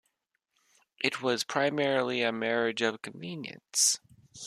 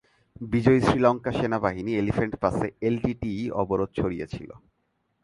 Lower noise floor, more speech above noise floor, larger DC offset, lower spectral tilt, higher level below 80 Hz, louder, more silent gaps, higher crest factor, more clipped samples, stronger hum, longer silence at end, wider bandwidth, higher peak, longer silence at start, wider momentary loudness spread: first, -80 dBFS vs -74 dBFS; about the same, 50 dB vs 49 dB; neither; second, -2 dB/octave vs -7.5 dB/octave; second, -76 dBFS vs -46 dBFS; second, -29 LUFS vs -25 LUFS; neither; about the same, 20 dB vs 20 dB; neither; neither; second, 0 s vs 0.65 s; first, 14 kHz vs 11.5 kHz; second, -10 dBFS vs -6 dBFS; first, 1 s vs 0.4 s; about the same, 14 LU vs 13 LU